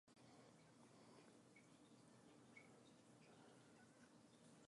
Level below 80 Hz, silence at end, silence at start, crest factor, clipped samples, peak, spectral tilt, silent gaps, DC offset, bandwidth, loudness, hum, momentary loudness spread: under -90 dBFS; 0 s; 0.05 s; 18 dB; under 0.1%; -52 dBFS; -4.5 dB/octave; none; under 0.1%; 11 kHz; -69 LUFS; none; 3 LU